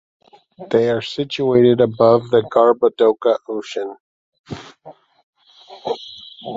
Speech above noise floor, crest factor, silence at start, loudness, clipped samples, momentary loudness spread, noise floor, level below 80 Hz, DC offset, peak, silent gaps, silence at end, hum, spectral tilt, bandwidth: 28 dB; 16 dB; 0.6 s; -17 LUFS; under 0.1%; 20 LU; -44 dBFS; -58 dBFS; under 0.1%; -2 dBFS; 4.00-4.32 s, 4.39-4.44 s, 5.23-5.33 s; 0 s; none; -7 dB/octave; 7.8 kHz